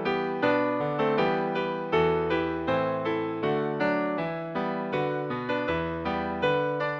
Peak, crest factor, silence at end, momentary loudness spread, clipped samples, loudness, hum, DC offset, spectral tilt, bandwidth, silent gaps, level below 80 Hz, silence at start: -12 dBFS; 16 dB; 0 s; 5 LU; under 0.1%; -27 LUFS; none; under 0.1%; -7.5 dB/octave; 7.2 kHz; none; -54 dBFS; 0 s